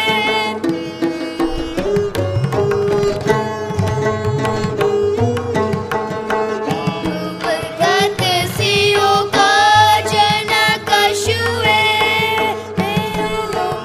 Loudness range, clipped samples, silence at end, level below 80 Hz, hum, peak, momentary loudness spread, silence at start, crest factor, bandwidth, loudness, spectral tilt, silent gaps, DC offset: 6 LU; under 0.1%; 0 s; -40 dBFS; none; 0 dBFS; 8 LU; 0 s; 16 dB; 15.5 kHz; -16 LUFS; -4 dB/octave; none; under 0.1%